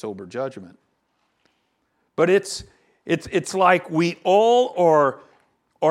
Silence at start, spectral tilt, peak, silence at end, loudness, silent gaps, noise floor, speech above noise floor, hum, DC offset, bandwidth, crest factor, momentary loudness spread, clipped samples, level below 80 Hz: 0.05 s; -5 dB/octave; -2 dBFS; 0 s; -20 LUFS; none; -70 dBFS; 50 dB; none; under 0.1%; 13.5 kHz; 20 dB; 15 LU; under 0.1%; -60 dBFS